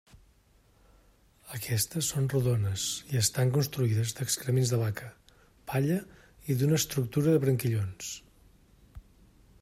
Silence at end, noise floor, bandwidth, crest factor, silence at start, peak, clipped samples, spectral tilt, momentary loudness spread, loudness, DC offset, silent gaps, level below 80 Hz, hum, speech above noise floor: 0.6 s; -63 dBFS; 16 kHz; 18 dB; 1.45 s; -12 dBFS; under 0.1%; -5 dB/octave; 13 LU; -29 LUFS; under 0.1%; none; -60 dBFS; none; 35 dB